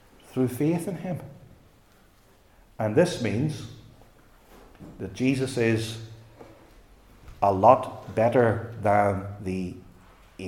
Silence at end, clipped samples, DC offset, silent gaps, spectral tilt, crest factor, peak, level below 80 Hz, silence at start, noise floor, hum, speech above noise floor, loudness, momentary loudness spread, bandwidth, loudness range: 0 s; under 0.1%; under 0.1%; none; -6.5 dB/octave; 24 dB; -2 dBFS; -56 dBFS; 0.35 s; -58 dBFS; none; 33 dB; -25 LUFS; 18 LU; 17.5 kHz; 7 LU